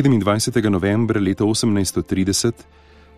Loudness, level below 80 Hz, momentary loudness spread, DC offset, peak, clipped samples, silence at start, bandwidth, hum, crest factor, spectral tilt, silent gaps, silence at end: -19 LUFS; -46 dBFS; 3 LU; 0.6%; -4 dBFS; under 0.1%; 0 s; 15.5 kHz; none; 16 dB; -5 dB/octave; none; 0.55 s